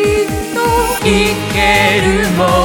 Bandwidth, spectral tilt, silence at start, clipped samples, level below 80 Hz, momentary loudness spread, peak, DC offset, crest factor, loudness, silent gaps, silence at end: 19.5 kHz; -4.5 dB/octave; 0 s; under 0.1%; -26 dBFS; 5 LU; 0 dBFS; under 0.1%; 12 dB; -12 LUFS; none; 0 s